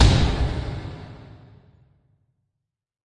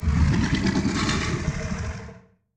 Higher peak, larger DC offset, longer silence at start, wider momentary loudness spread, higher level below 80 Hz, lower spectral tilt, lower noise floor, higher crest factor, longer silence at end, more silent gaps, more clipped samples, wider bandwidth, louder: first, -2 dBFS vs -10 dBFS; neither; about the same, 0 s vs 0 s; first, 24 LU vs 12 LU; about the same, -28 dBFS vs -32 dBFS; about the same, -5.5 dB/octave vs -5.5 dB/octave; first, -81 dBFS vs -46 dBFS; first, 22 dB vs 14 dB; first, 1.95 s vs 0.35 s; neither; neither; about the same, 11 kHz vs 10 kHz; about the same, -24 LUFS vs -24 LUFS